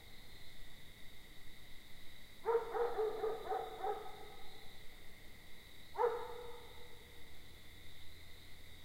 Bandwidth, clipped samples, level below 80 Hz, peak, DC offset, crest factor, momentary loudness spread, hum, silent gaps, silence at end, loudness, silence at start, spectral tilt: 16 kHz; under 0.1%; -60 dBFS; -24 dBFS; under 0.1%; 20 dB; 19 LU; none; none; 0 s; -41 LUFS; 0 s; -4 dB/octave